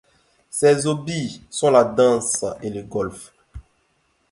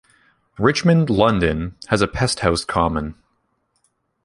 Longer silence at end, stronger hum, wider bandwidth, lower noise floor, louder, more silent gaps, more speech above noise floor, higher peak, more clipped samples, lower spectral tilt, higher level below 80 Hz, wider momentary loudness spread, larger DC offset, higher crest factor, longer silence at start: second, 0.7 s vs 1.1 s; neither; about the same, 11.5 kHz vs 11.5 kHz; about the same, -66 dBFS vs -68 dBFS; about the same, -20 LUFS vs -19 LUFS; neither; second, 46 dB vs 50 dB; about the same, -2 dBFS vs -2 dBFS; neither; about the same, -4.5 dB/octave vs -5.5 dB/octave; second, -52 dBFS vs -38 dBFS; first, 14 LU vs 8 LU; neither; about the same, 20 dB vs 18 dB; about the same, 0.55 s vs 0.6 s